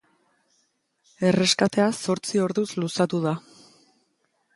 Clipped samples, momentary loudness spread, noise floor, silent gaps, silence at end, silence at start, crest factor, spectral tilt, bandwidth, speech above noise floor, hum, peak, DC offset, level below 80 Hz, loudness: under 0.1%; 7 LU; -71 dBFS; none; 1.15 s; 1.2 s; 20 dB; -4.5 dB/octave; 11.5 kHz; 48 dB; none; -6 dBFS; under 0.1%; -68 dBFS; -23 LUFS